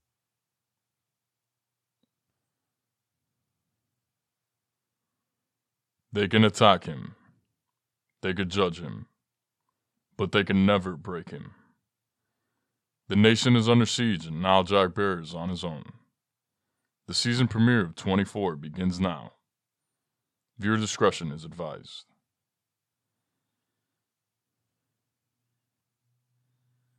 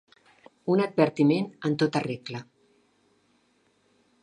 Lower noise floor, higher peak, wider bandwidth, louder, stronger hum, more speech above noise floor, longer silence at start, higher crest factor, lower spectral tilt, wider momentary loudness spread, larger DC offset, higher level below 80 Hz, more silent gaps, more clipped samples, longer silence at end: first, -87 dBFS vs -67 dBFS; about the same, -4 dBFS vs -6 dBFS; about the same, 11 kHz vs 11 kHz; about the same, -25 LUFS vs -26 LUFS; neither; first, 62 dB vs 42 dB; first, 6.1 s vs 0.65 s; about the same, 26 dB vs 22 dB; second, -5.5 dB/octave vs -7 dB/octave; first, 18 LU vs 15 LU; neither; first, -64 dBFS vs -72 dBFS; neither; neither; first, 5 s vs 1.8 s